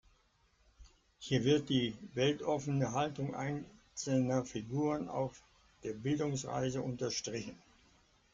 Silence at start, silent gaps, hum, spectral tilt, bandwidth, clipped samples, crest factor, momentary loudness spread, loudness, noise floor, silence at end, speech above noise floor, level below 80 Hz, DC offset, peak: 0.8 s; none; none; -5.5 dB/octave; 7.8 kHz; under 0.1%; 18 dB; 12 LU; -36 LUFS; -72 dBFS; 0.8 s; 37 dB; -66 dBFS; under 0.1%; -18 dBFS